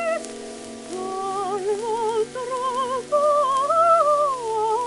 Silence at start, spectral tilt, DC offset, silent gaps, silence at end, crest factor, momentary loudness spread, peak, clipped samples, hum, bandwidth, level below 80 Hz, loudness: 0 s; -3 dB/octave; under 0.1%; none; 0 s; 16 dB; 16 LU; -8 dBFS; under 0.1%; none; 11.5 kHz; -62 dBFS; -22 LUFS